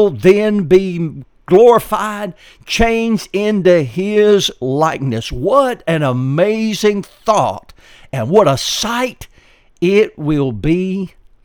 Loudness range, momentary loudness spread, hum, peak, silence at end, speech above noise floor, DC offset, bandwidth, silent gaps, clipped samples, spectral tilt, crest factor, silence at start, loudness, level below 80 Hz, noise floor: 3 LU; 11 LU; none; 0 dBFS; 0.35 s; 34 dB; under 0.1%; 19 kHz; none; under 0.1%; -5.5 dB/octave; 14 dB; 0 s; -14 LUFS; -36 dBFS; -48 dBFS